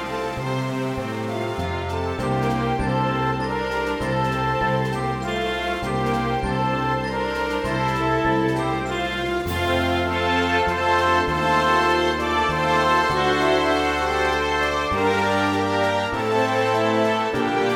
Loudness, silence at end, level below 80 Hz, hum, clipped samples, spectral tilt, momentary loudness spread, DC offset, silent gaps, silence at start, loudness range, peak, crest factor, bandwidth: -22 LUFS; 0 s; -40 dBFS; none; under 0.1%; -5.5 dB/octave; 6 LU; under 0.1%; none; 0 s; 4 LU; -8 dBFS; 14 dB; 17 kHz